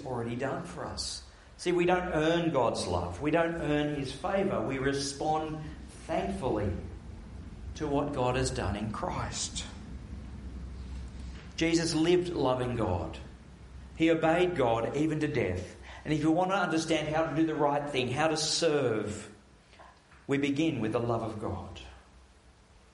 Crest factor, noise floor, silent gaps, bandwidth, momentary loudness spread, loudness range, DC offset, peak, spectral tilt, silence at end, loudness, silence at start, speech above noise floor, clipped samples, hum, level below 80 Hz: 18 dB; -58 dBFS; none; 11.5 kHz; 17 LU; 5 LU; under 0.1%; -12 dBFS; -5 dB/octave; 0.75 s; -30 LUFS; 0 s; 29 dB; under 0.1%; none; -48 dBFS